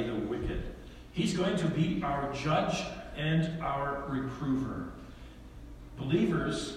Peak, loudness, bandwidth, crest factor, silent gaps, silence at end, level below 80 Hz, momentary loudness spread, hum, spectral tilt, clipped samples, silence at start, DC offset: -14 dBFS; -32 LUFS; 12 kHz; 18 dB; none; 0 s; -48 dBFS; 19 LU; none; -6 dB/octave; under 0.1%; 0 s; under 0.1%